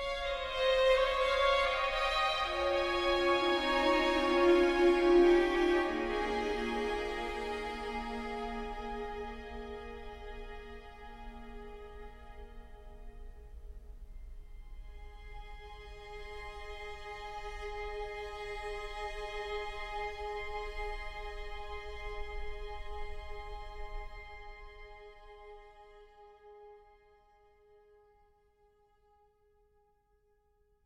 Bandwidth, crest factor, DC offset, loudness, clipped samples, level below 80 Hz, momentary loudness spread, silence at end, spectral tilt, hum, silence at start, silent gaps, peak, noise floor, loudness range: 12 kHz; 20 dB; under 0.1%; -33 LUFS; under 0.1%; -48 dBFS; 26 LU; 4 s; -4.5 dB/octave; none; 0 s; none; -16 dBFS; -72 dBFS; 24 LU